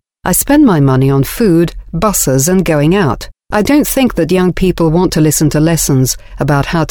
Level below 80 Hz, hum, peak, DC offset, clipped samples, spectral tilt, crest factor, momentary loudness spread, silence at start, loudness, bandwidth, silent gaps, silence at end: -28 dBFS; none; 0 dBFS; under 0.1%; under 0.1%; -5.5 dB/octave; 10 dB; 6 LU; 0.25 s; -11 LUFS; over 20 kHz; none; 0 s